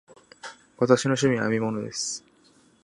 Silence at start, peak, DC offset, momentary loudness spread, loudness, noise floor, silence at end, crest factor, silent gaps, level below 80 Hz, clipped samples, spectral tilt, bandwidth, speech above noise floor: 0.45 s; -4 dBFS; under 0.1%; 22 LU; -24 LUFS; -59 dBFS; 0.65 s; 22 dB; none; -64 dBFS; under 0.1%; -4.5 dB/octave; 11.5 kHz; 35 dB